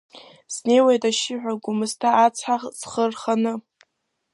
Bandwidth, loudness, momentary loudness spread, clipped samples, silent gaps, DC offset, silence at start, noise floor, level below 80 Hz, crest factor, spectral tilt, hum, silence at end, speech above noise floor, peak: 11.5 kHz; -21 LUFS; 11 LU; under 0.1%; none; under 0.1%; 0.15 s; -71 dBFS; -74 dBFS; 18 dB; -3.5 dB/octave; none; 0.75 s; 50 dB; -4 dBFS